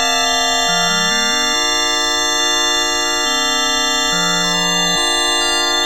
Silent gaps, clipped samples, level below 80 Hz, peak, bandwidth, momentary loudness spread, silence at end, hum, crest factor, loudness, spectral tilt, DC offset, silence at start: none; under 0.1%; -44 dBFS; -2 dBFS; 19.5 kHz; 1 LU; 0 s; none; 14 dB; -14 LUFS; -0.5 dB/octave; 2%; 0 s